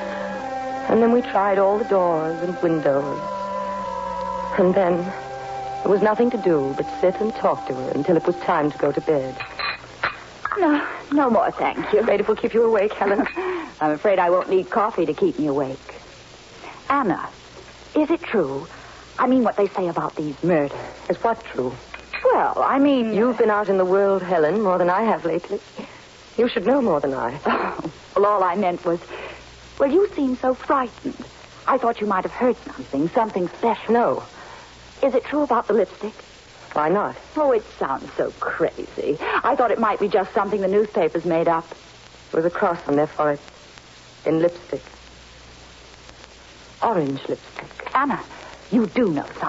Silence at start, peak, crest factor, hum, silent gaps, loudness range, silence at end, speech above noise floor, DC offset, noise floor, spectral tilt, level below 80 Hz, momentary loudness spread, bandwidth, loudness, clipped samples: 0 s; -6 dBFS; 16 dB; none; none; 5 LU; 0 s; 25 dB; under 0.1%; -45 dBFS; -6.5 dB/octave; -54 dBFS; 13 LU; 8 kHz; -21 LUFS; under 0.1%